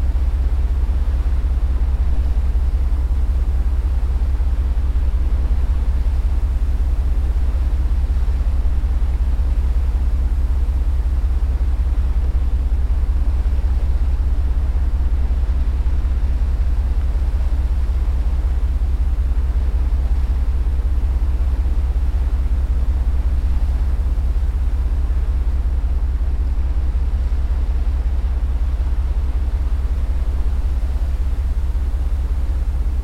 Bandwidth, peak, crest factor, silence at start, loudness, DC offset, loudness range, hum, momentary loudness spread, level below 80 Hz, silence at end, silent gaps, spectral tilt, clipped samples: 5 kHz; -6 dBFS; 10 dB; 0 s; -21 LUFS; under 0.1%; 1 LU; none; 2 LU; -16 dBFS; 0 s; none; -8 dB/octave; under 0.1%